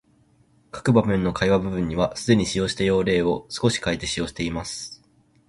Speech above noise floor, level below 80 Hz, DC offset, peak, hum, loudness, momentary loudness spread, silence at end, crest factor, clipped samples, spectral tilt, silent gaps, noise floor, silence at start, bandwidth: 38 dB; -44 dBFS; under 0.1%; -4 dBFS; none; -23 LUFS; 9 LU; 0.55 s; 18 dB; under 0.1%; -5.5 dB/octave; none; -60 dBFS; 0.75 s; 11.5 kHz